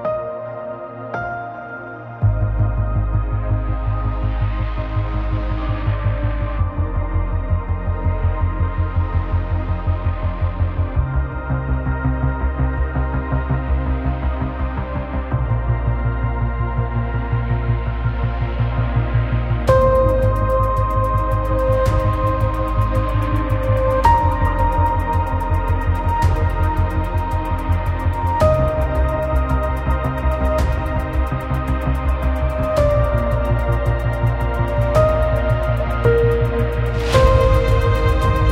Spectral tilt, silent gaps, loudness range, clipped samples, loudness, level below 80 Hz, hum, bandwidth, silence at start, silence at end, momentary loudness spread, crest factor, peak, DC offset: -8 dB/octave; none; 5 LU; under 0.1%; -20 LUFS; -22 dBFS; none; 13 kHz; 0 s; 0 s; 7 LU; 16 dB; -2 dBFS; under 0.1%